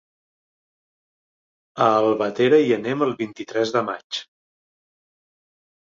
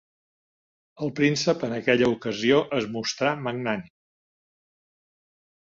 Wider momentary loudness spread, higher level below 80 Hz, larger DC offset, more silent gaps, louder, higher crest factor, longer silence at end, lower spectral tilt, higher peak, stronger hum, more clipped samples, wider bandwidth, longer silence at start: first, 13 LU vs 8 LU; second, -70 dBFS vs -64 dBFS; neither; first, 4.04-4.10 s vs none; first, -21 LUFS vs -25 LUFS; about the same, 20 dB vs 20 dB; second, 1.7 s vs 1.85 s; about the same, -5.5 dB/octave vs -5 dB/octave; first, -4 dBFS vs -8 dBFS; neither; neither; about the same, 7.6 kHz vs 7.8 kHz; first, 1.75 s vs 1 s